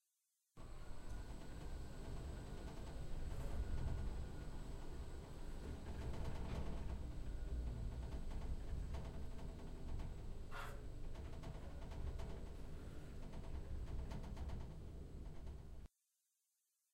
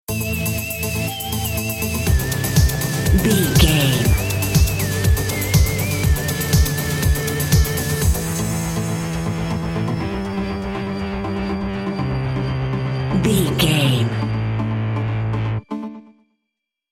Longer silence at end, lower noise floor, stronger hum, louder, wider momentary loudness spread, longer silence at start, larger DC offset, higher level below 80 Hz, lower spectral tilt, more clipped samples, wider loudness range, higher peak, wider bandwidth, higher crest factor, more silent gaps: first, 1.05 s vs 0.9 s; first, -87 dBFS vs -80 dBFS; neither; second, -52 LUFS vs -20 LUFS; about the same, 7 LU vs 8 LU; first, 0.55 s vs 0.1 s; neither; second, -48 dBFS vs -26 dBFS; first, -6.5 dB/octave vs -5 dB/octave; neither; about the same, 4 LU vs 6 LU; second, -32 dBFS vs 0 dBFS; about the same, 15.5 kHz vs 17 kHz; about the same, 16 dB vs 20 dB; neither